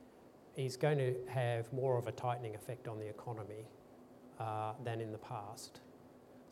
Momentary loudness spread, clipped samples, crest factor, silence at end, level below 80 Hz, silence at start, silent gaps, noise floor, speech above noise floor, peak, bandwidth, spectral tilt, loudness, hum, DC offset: 23 LU; under 0.1%; 20 dB; 0 s; -78 dBFS; 0 s; none; -61 dBFS; 21 dB; -22 dBFS; 16 kHz; -6.5 dB/octave; -40 LUFS; none; under 0.1%